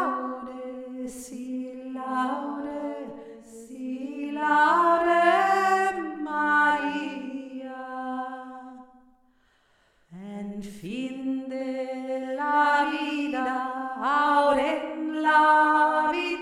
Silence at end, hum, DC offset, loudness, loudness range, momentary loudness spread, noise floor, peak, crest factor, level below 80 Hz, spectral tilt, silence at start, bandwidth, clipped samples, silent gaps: 0 s; none; under 0.1%; -25 LUFS; 15 LU; 18 LU; -65 dBFS; -10 dBFS; 18 dB; -66 dBFS; -4 dB/octave; 0 s; 14 kHz; under 0.1%; none